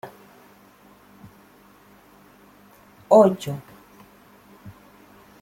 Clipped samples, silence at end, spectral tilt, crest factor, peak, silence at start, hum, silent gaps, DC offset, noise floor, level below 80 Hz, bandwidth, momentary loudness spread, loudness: under 0.1%; 0.7 s; -7 dB/octave; 24 dB; -2 dBFS; 0.05 s; 50 Hz at -55 dBFS; none; under 0.1%; -52 dBFS; -66 dBFS; 16.5 kHz; 31 LU; -19 LUFS